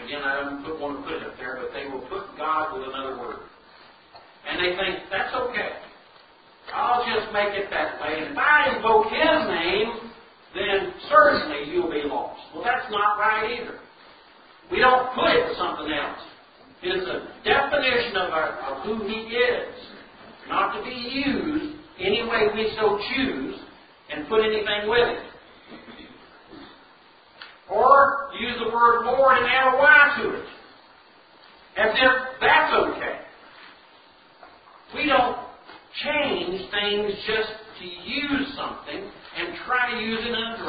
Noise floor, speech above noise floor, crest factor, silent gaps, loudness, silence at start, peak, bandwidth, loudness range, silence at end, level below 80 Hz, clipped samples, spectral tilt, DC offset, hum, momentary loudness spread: -53 dBFS; 30 dB; 22 dB; none; -22 LUFS; 0 s; -2 dBFS; 5 kHz; 9 LU; 0 s; -54 dBFS; under 0.1%; -8 dB/octave; under 0.1%; none; 17 LU